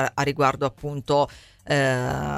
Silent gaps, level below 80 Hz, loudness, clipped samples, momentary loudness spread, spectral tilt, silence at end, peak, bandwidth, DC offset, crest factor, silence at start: none; -46 dBFS; -24 LUFS; under 0.1%; 6 LU; -5.5 dB/octave; 0 s; -6 dBFS; 15.5 kHz; under 0.1%; 18 dB; 0 s